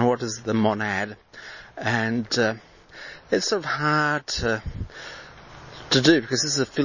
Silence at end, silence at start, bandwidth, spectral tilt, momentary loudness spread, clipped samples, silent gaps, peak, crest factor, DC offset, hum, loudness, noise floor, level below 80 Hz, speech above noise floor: 0 s; 0 s; 7.4 kHz; -4 dB/octave; 21 LU; under 0.1%; none; -4 dBFS; 20 dB; under 0.1%; none; -23 LUFS; -44 dBFS; -46 dBFS; 20 dB